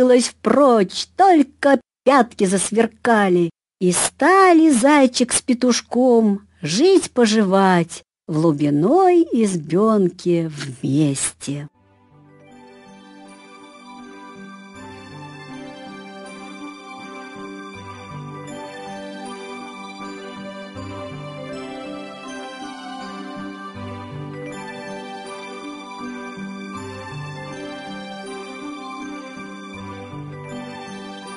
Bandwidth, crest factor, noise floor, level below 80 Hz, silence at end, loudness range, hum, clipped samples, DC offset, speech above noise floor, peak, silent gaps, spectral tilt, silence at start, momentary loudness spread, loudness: 12 kHz; 20 dB; -52 dBFS; -58 dBFS; 0 s; 20 LU; none; under 0.1%; under 0.1%; 36 dB; -2 dBFS; none; -5 dB/octave; 0 s; 21 LU; -17 LUFS